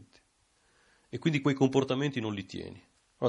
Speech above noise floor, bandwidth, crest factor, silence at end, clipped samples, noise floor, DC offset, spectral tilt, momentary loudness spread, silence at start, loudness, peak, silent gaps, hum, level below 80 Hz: 40 dB; 10.5 kHz; 20 dB; 0 s; under 0.1%; -70 dBFS; under 0.1%; -6.5 dB/octave; 16 LU; 1.15 s; -30 LUFS; -12 dBFS; none; none; -64 dBFS